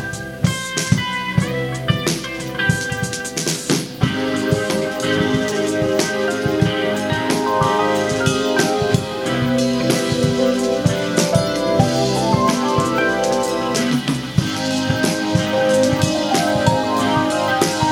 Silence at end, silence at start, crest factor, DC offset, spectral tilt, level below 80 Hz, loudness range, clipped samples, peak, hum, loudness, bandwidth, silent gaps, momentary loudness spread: 0 s; 0 s; 18 dB; under 0.1%; -4.5 dB/octave; -42 dBFS; 3 LU; under 0.1%; 0 dBFS; none; -18 LUFS; 16.5 kHz; none; 4 LU